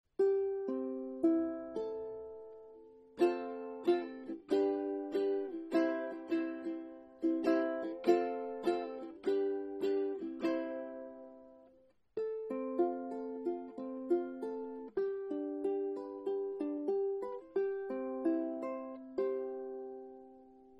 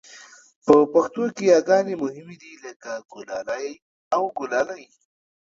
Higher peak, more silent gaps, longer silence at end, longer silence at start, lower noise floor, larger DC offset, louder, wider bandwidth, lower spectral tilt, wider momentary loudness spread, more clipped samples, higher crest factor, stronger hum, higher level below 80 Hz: second, -16 dBFS vs 0 dBFS; second, none vs 0.56-0.61 s, 2.76-2.80 s, 3.82-4.11 s; second, 0 s vs 0.65 s; about the same, 0.2 s vs 0.15 s; first, -67 dBFS vs -47 dBFS; neither; second, -37 LUFS vs -21 LUFS; first, 9 kHz vs 7.8 kHz; first, -6.5 dB/octave vs -5 dB/octave; second, 13 LU vs 22 LU; neither; about the same, 20 dB vs 22 dB; neither; second, -78 dBFS vs -66 dBFS